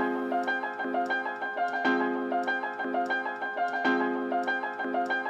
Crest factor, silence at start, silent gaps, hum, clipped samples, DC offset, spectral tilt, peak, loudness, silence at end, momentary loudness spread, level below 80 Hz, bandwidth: 16 dB; 0 s; none; none; under 0.1%; under 0.1%; -4.5 dB/octave; -14 dBFS; -29 LUFS; 0 s; 4 LU; under -90 dBFS; 9 kHz